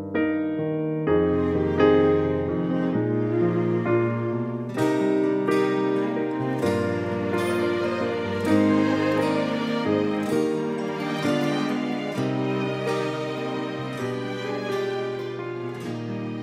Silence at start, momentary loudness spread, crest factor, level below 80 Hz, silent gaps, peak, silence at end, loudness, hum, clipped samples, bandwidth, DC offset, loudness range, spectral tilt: 0 s; 8 LU; 18 dB; -54 dBFS; none; -6 dBFS; 0 s; -24 LUFS; none; under 0.1%; 15 kHz; under 0.1%; 5 LU; -7 dB/octave